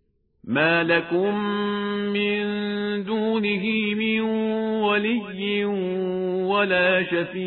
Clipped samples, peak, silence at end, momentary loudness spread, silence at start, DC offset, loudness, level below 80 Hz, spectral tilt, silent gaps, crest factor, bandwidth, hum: under 0.1%; -6 dBFS; 0 s; 7 LU; 0.45 s; under 0.1%; -23 LUFS; -62 dBFS; -9 dB/octave; none; 16 dB; 4.3 kHz; none